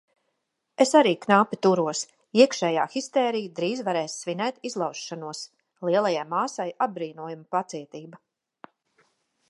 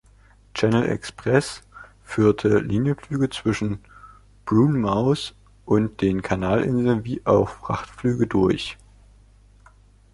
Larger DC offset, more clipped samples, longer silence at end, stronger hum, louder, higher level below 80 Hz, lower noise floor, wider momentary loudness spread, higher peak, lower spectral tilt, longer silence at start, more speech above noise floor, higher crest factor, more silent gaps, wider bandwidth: neither; neither; about the same, 1.35 s vs 1.4 s; second, none vs 50 Hz at -45 dBFS; second, -25 LUFS vs -22 LUFS; second, -78 dBFS vs -46 dBFS; first, -78 dBFS vs -53 dBFS; first, 16 LU vs 10 LU; about the same, -4 dBFS vs -4 dBFS; second, -4.5 dB/octave vs -7 dB/octave; first, 0.8 s vs 0.55 s; first, 53 dB vs 32 dB; about the same, 22 dB vs 20 dB; neither; about the same, 11.5 kHz vs 11.5 kHz